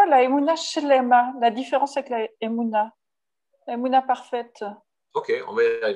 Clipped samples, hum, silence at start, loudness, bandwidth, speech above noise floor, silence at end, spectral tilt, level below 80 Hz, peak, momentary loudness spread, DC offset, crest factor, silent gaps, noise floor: under 0.1%; none; 0 s; -22 LUFS; 10.5 kHz; 66 dB; 0 s; -3.5 dB/octave; -84 dBFS; -6 dBFS; 14 LU; under 0.1%; 16 dB; none; -88 dBFS